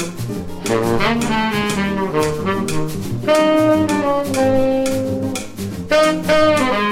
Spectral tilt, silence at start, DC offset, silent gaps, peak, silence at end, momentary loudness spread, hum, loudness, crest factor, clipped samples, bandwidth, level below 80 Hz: -5 dB/octave; 0 s; under 0.1%; none; -2 dBFS; 0 s; 10 LU; none; -17 LUFS; 14 dB; under 0.1%; 16.5 kHz; -38 dBFS